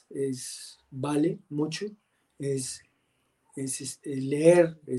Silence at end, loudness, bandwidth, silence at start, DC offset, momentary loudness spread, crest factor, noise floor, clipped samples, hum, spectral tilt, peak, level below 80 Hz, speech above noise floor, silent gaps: 0 s; -28 LUFS; 12.5 kHz; 0.1 s; under 0.1%; 19 LU; 22 dB; -73 dBFS; under 0.1%; none; -5.5 dB/octave; -6 dBFS; -72 dBFS; 45 dB; none